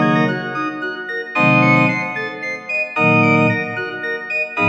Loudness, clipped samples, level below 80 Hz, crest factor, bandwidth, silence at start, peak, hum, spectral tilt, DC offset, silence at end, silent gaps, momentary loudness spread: -17 LUFS; under 0.1%; -60 dBFS; 16 dB; 7.8 kHz; 0 s; 0 dBFS; none; -7 dB/octave; under 0.1%; 0 s; none; 11 LU